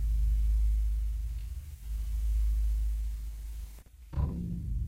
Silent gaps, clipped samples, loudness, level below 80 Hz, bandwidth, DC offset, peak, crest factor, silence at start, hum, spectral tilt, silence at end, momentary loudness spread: none; under 0.1%; -34 LUFS; -30 dBFS; 9 kHz; under 0.1%; -20 dBFS; 12 dB; 0 s; none; -7.5 dB/octave; 0 s; 13 LU